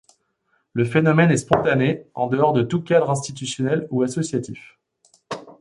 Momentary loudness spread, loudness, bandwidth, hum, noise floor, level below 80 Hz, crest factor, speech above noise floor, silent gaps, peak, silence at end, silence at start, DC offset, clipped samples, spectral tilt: 16 LU; -20 LUFS; 11.5 kHz; none; -68 dBFS; -58 dBFS; 20 dB; 49 dB; none; -2 dBFS; 0.1 s; 0.75 s; under 0.1%; under 0.1%; -6 dB/octave